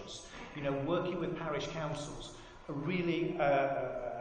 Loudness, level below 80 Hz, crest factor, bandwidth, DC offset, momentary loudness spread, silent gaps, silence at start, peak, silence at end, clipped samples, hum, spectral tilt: -35 LUFS; -58 dBFS; 18 dB; 10 kHz; under 0.1%; 15 LU; none; 0 s; -18 dBFS; 0 s; under 0.1%; none; -6 dB/octave